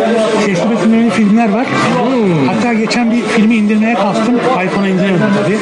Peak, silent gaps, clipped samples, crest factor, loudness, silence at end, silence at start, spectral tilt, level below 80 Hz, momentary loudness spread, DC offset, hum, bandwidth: -2 dBFS; none; under 0.1%; 10 dB; -11 LUFS; 0 s; 0 s; -6 dB/octave; -52 dBFS; 2 LU; under 0.1%; none; 10.5 kHz